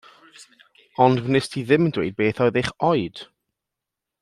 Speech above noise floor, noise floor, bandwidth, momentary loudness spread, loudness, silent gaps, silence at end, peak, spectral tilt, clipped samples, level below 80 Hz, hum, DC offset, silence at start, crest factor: 64 dB; -85 dBFS; 12.5 kHz; 10 LU; -21 LUFS; none; 1 s; -2 dBFS; -6.5 dB/octave; under 0.1%; -56 dBFS; none; under 0.1%; 0.4 s; 20 dB